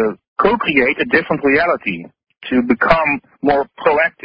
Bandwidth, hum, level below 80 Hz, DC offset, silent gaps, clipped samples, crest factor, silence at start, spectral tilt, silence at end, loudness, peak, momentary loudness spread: 5.4 kHz; none; -44 dBFS; under 0.1%; 0.28-0.36 s; under 0.1%; 16 dB; 0 s; -8 dB/octave; 0.15 s; -15 LUFS; 0 dBFS; 7 LU